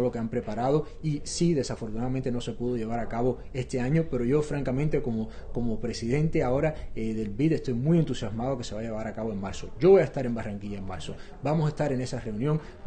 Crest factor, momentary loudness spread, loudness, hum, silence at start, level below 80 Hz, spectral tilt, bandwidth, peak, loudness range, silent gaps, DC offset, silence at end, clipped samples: 18 dB; 9 LU; -28 LUFS; none; 0 s; -42 dBFS; -7 dB/octave; 9.6 kHz; -10 dBFS; 3 LU; none; under 0.1%; 0 s; under 0.1%